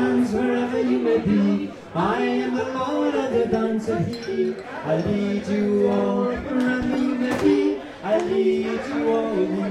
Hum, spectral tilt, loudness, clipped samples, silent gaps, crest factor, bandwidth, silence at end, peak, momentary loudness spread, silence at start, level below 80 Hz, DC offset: none; -7 dB/octave; -22 LUFS; under 0.1%; none; 14 dB; 11.5 kHz; 0 s; -8 dBFS; 5 LU; 0 s; -50 dBFS; under 0.1%